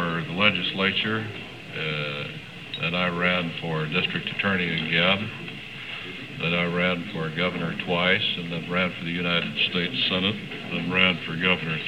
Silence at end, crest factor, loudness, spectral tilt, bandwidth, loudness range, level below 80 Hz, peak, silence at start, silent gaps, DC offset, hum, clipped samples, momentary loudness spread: 0 s; 22 dB; -24 LUFS; -6 dB/octave; 10.5 kHz; 2 LU; -58 dBFS; -4 dBFS; 0 s; none; 0.2%; none; under 0.1%; 13 LU